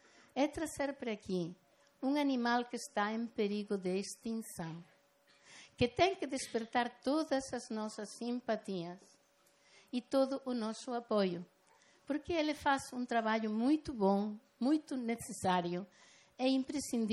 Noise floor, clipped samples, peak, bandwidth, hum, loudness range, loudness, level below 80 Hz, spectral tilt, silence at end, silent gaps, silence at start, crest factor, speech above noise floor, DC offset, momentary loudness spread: -71 dBFS; under 0.1%; -18 dBFS; 15 kHz; none; 5 LU; -37 LUFS; -68 dBFS; -5 dB/octave; 0 s; none; 0.35 s; 20 dB; 35 dB; under 0.1%; 10 LU